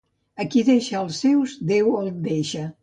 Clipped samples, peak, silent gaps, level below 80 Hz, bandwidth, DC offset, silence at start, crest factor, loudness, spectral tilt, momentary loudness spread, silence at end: under 0.1%; -8 dBFS; none; -64 dBFS; 9.4 kHz; under 0.1%; 0.35 s; 14 dB; -22 LUFS; -6 dB/octave; 8 LU; 0.1 s